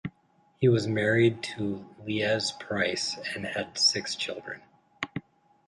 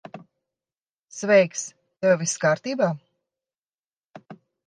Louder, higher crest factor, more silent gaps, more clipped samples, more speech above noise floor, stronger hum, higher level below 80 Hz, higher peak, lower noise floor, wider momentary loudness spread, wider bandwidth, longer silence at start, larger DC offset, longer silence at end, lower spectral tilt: second, -28 LUFS vs -22 LUFS; about the same, 18 dB vs 20 dB; second, none vs 0.81-0.85 s, 0.93-1.08 s, 3.58-3.62 s, 3.74-3.91 s, 3.97-4.10 s; neither; second, 38 dB vs over 69 dB; neither; first, -64 dBFS vs -78 dBFS; second, -12 dBFS vs -6 dBFS; second, -65 dBFS vs under -90 dBFS; second, 15 LU vs 18 LU; first, 11.5 kHz vs 10 kHz; about the same, 0.05 s vs 0.15 s; neither; first, 0.45 s vs 0.3 s; about the same, -4 dB/octave vs -4.5 dB/octave